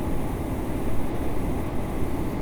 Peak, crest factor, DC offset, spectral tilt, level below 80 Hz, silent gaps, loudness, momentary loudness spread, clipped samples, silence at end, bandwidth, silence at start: -12 dBFS; 14 dB; under 0.1%; -7.5 dB/octave; -32 dBFS; none; -30 LUFS; 1 LU; under 0.1%; 0 s; over 20 kHz; 0 s